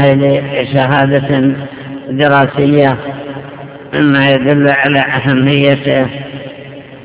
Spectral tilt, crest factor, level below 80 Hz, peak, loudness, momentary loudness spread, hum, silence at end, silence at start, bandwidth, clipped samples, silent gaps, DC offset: -10.5 dB/octave; 12 dB; -44 dBFS; 0 dBFS; -11 LUFS; 17 LU; none; 0 s; 0 s; 4 kHz; 0.7%; none; under 0.1%